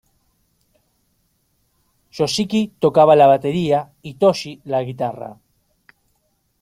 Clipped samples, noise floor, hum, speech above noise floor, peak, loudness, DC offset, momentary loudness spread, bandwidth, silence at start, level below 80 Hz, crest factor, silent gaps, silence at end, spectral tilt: under 0.1%; -67 dBFS; none; 50 dB; -2 dBFS; -17 LUFS; under 0.1%; 19 LU; 15.5 kHz; 2.15 s; -60 dBFS; 18 dB; none; 1.3 s; -5.5 dB/octave